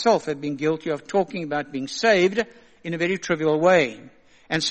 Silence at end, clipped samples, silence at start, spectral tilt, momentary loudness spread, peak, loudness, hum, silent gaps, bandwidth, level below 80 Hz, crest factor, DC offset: 0 s; under 0.1%; 0 s; -4.5 dB/octave; 11 LU; -4 dBFS; -23 LUFS; none; none; 8.8 kHz; -62 dBFS; 18 dB; under 0.1%